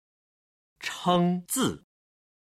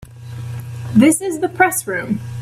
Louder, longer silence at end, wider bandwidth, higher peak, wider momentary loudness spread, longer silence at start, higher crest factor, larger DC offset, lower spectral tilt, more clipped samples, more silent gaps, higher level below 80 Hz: second, -27 LUFS vs -16 LUFS; first, 0.8 s vs 0 s; about the same, 16 kHz vs 16 kHz; second, -10 dBFS vs 0 dBFS; second, 13 LU vs 16 LU; first, 0.8 s vs 0.05 s; about the same, 20 dB vs 18 dB; neither; about the same, -4.5 dB/octave vs -5 dB/octave; neither; neither; second, -64 dBFS vs -50 dBFS